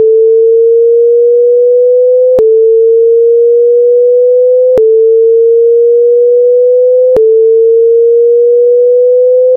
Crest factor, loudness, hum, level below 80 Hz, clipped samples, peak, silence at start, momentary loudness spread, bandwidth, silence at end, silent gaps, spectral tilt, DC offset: 4 dB; -6 LUFS; none; -50 dBFS; under 0.1%; -2 dBFS; 0 s; 0 LU; 1.3 kHz; 0 s; none; -5.5 dB/octave; under 0.1%